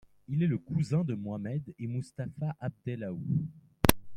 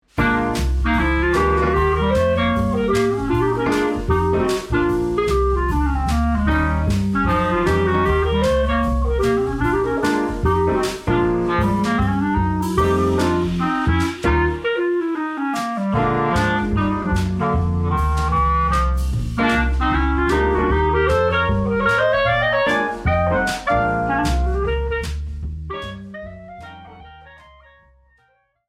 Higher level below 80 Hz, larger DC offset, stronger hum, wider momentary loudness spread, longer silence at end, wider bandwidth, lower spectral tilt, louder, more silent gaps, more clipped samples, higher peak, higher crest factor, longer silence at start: second, -50 dBFS vs -26 dBFS; neither; neither; first, 11 LU vs 5 LU; second, 0 s vs 1.35 s; first, 16.5 kHz vs 14.5 kHz; about the same, -5.5 dB/octave vs -6.5 dB/octave; second, -33 LUFS vs -19 LUFS; neither; neither; about the same, -2 dBFS vs -4 dBFS; first, 30 dB vs 14 dB; first, 0.3 s vs 0.15 s